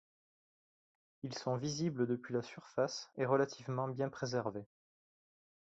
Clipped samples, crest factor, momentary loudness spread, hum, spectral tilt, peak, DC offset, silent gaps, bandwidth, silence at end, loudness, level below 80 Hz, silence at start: under 0.1%; 22 dB; 9 LU; none; -5.5 dB/octave; -18 dBFS; under 0.1%; none; 8 kHz; 0.95 s; -38 LUFS; -76 dBFS; 1.25 s